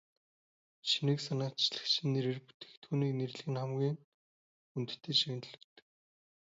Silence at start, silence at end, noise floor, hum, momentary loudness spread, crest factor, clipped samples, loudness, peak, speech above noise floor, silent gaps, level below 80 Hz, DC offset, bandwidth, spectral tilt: 0.85 s; 0.95 s; under -90 dBFS; none; 14 LU; 20 dB; under 0.1%; -35 LUFS; -16 dBFS; over 55 dB; 2.54-2.60 s, 2.77-2.82 s, 4.04-4.75 s; -82 dBFS; under 0.1%; 7.6 kHz; -4.5 dB/octave